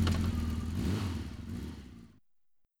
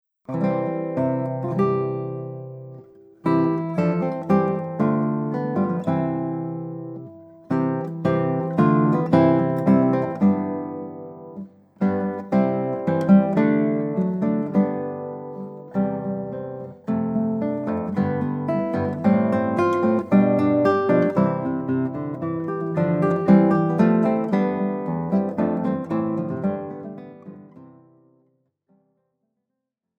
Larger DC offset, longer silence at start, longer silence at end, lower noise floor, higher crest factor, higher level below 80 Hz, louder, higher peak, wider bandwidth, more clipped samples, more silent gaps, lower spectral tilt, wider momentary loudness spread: neither; second, 0 s vs 0.3 s; second, 0.75 s vs 2.3 s; second, -75 dBFS vs -81 dBFS; about the same, 18 dB vs 18 dB; first, -42 dBFS vs -64 dBFS; second, -36 LUFS vs -22 LUFS; second, -18 dBFS vs -4 dBFS; first, 16.5 kHz vs 5.8 kHz; neither; neither; second, -6.5 dB/octave vs -10 dB/octave; about the same, 17 LU vs 16 LU